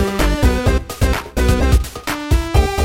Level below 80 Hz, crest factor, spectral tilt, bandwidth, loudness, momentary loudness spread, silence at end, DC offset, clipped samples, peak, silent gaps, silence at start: -18 dBFS; 14 dB; -5.5 dB/octave; 16.5 kHz; -17 LUFS; 4 LU; 0 s; under 0.1%; under 0.1%; -2 dBFS; none; 0 s